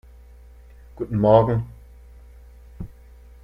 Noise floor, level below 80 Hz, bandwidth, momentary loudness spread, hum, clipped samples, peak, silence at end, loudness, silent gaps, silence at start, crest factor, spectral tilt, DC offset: -46 dBFS; -44 dBFS; 5.2 kHz; 24 LU; none; under 0.1%; -2 dBFS; 0.55 s; -20 LUFS; none; 0.95 s; 22 dB; -10 dB/octave; under 0.1%